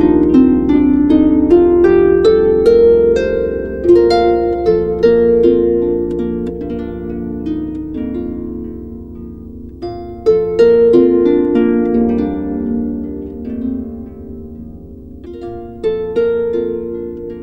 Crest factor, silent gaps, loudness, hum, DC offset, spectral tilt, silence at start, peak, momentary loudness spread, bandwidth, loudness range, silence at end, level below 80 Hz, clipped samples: 12 dB; none; -13 LUFS; none; under 0.1%; -8.5 dB/octave; 0 s; 0 dBFS; 20 LU; 7.4 kHz; 13 LU; 0 s; -34 dBFS; under 0.1%